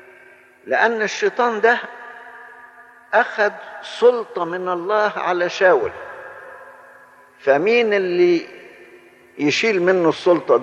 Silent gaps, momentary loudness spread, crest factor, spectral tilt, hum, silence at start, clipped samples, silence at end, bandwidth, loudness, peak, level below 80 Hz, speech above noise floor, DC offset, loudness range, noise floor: none; 20 LU; 18 dB; -4.5 dB/octave; none; 0.65 s; under 0.1%; 0 s; 8.6 kHz; -18 LUFS; -2 dBFS; -68 dBFS; 30 dB; under 0.1%; 3 LU; -48 dBFS